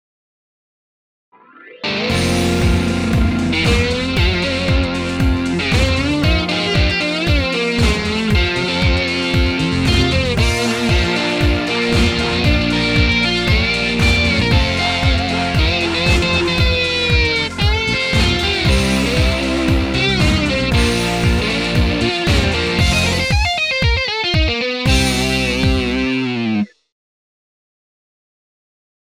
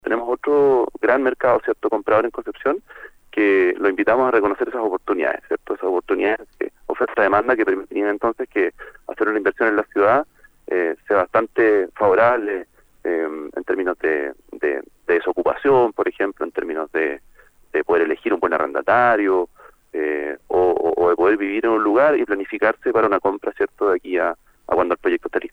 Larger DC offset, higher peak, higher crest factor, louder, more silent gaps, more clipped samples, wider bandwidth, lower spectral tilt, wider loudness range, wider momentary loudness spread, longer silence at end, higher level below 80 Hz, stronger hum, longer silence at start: neither; about the same, -2 dBFS vs -2 dBFS; about the same, 14 dB vs 18 dB; first, -15 LUFS vs -20 LUFS; neither; neither; first, 15.5 kHz vs 5 kHz; second, -5 dB/octave vs -7 dB/octave; about the same, 3 LU vs 3 LU; second, 3 LU vs 10 LU; first, 2.35 s vs 0.05 s; first, -24 dBFS vs -54 dBFS; neither; first, 1.65 s vs 0.05 s